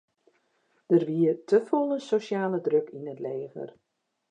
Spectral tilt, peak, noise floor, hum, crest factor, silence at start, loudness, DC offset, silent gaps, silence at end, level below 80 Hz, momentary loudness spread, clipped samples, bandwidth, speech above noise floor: -7.5 dB/octave; -10 dBFS; -71 dBFS; none; 18 dB; 0.9 s; -27 LUFS; under 0.1%; none; 0.65 s; -84 dBFS; 15 LU; under 0.1%; 9.2 kHz; 45 dB